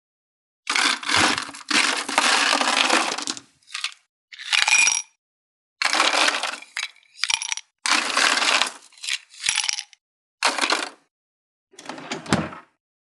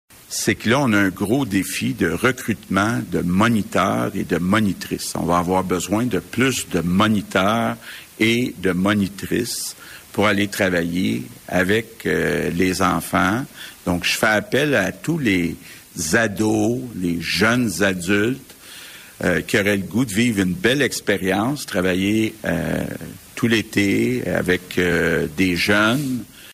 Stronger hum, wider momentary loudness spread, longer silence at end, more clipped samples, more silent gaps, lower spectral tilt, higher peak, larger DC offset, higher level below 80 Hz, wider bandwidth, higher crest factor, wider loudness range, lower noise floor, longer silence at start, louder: neither; first, 16 LU vs 8 LU; first, 0.6 s vs 0 s; neither; first, 4.09-4.28 s, 5.18-5.76 s, 10.01-10.38 s, 11.11-11.67 s vs none; second, -0.5 dB/octave vs -4.5 dB/octave; first, 0 dBFS vs -6 dBFS; neither; second, -68 dBFS vs -48 dBFS; second, 13.5 kHz vs 16 kHz; first, 24 dB vs 14 dB; first, 6 LU vs 1 LU; first, under -90 dBFS vs -40 dBFS; first, 0.65 s vs 0.3 s; about the same, -20 LUFS vs -20 LUFS